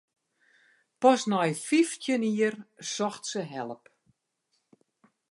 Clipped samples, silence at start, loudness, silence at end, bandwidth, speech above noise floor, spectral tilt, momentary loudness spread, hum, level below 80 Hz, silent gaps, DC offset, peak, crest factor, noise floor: under 0.1%; 1 s; -28 LUFS; 1.55 s; 11.5 kHz; 50 dB; -4.5 dB/octave; 15 LU; none; -84 dBFS; none; under 0.1%; -8 dBFS; 22 dB; -77 dBFS